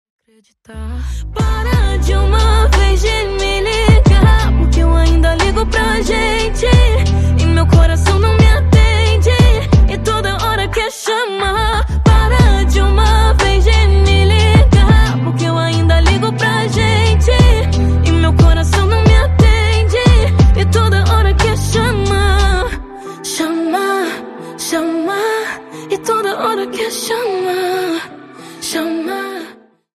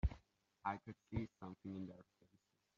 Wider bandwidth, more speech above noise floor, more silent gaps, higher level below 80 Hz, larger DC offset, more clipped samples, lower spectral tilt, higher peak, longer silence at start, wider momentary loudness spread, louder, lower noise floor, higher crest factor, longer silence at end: first, 13.5 kHz vs 7.2 kHz; second, 23 dB vs 31 dB; neither; first, -14 dBFS vs -54 dBFS; neither; neither; second, -5.5 dB/octave vs -7.5 dB/octave; first, 0 dBFS vs -26 dBFS; first, 0.7 s vs 0.05 s; about the same, 10 LU vs 10 LU; first, -13 LUFS vs -49 LUFS; second, -38 dBFS vs -80 dBFS; second, 10 dB vs 22 dB; second, 0.45 s vs 0.75 s